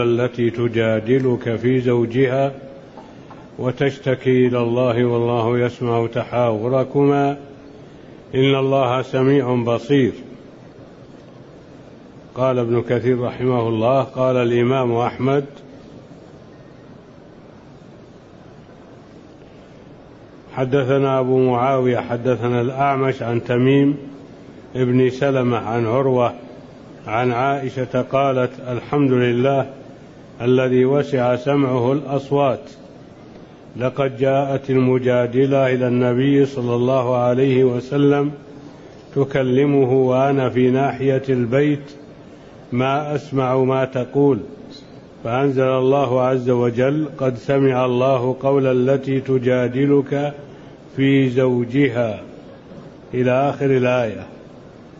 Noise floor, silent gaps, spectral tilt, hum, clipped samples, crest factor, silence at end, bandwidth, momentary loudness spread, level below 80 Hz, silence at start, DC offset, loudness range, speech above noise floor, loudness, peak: -42 dBFS; none; -8 dB/octave; none; under 0.1%; 14 dB; 0 s; 7.4 kHz; 10 LU; -54 dBFS; 0 s; under 0.1%; 3 LU; 25 dB; -18 LUFS; -6 dBFS